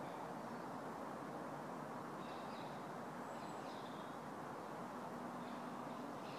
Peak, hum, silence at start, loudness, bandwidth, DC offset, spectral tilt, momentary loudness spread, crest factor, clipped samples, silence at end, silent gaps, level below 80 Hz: -36 dBFS; none; 0 s; -49 LUFS; 15.5 kHz; under 0.1%; -5.5 dB/octave; 1 LU; 12 dB; under 0.1%; 0 s; none; -82 dBFS